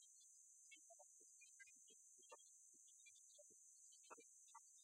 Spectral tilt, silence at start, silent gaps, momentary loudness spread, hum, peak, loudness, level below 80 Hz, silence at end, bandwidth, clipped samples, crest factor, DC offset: 1.5 dB/octave; 0 s; none; 2 LU; none; -46 dBFS; -65 LUFS; under -90 dBFS; 0 s; 13.5 kHz; under 0.1%; 22 dB; under 0.1%